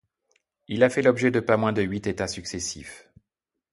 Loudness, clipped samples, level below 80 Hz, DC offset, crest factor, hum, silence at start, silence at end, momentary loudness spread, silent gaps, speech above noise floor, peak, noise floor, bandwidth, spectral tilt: -24 LUFS; under 0.1%; -54 dBFS; under 0.1%; 22 dB; none; 0.7 s; 0.75 s; 13 LU; none; 62 dB; -4 dBFS; -85 dBFS; 11.5 kHz; -5 dB/octave